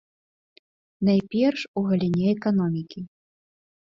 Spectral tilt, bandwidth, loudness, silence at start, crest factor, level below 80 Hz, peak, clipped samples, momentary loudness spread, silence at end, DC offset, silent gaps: -8.5 dB/octave; 7.2 kHz; -24 LUFS; 1 s; 16 dB; -62 dBFS; -10 dBFS; under 0.1%; 14 LU; 0.8 s; under 0.1%; 1.68-1.74 s